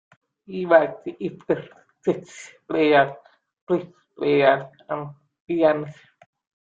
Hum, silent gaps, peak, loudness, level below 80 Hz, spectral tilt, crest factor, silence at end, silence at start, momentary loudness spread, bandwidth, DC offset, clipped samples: none; 3.61-3.67 s, 5.40-5.47 s; -2 dBFS; -22 LUFS; -68 dBFS; -6.5 dB/octave; 20 dB; 0.7 s; 0.5 s; 17 LU; 7.8 kHz; under 0.1%; under 0.1%